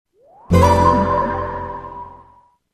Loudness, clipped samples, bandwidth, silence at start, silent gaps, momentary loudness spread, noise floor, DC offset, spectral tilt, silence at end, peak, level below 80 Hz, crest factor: -16 LUFS; under 0.1%; 14.5 kHz; 0.5 s; none; 21 LU; -52 dBFS; under 0.1%; -7 dB/octave; 0.6 s; -2 dBFS; -32 dBFS; 16 dB